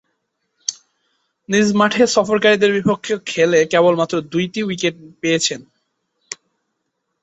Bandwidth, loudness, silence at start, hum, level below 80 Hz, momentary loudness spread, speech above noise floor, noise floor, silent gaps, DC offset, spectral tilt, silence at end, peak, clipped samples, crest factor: 8.2 kHz; -17 LUFS; 0.7 s; none; -60 dBFS; 13 LU; 57 dB; -74 dBFS; none; under 0.1%; -4 dB/octave; 0.9 s; -2 dBFS; under 0.1%; 16 dB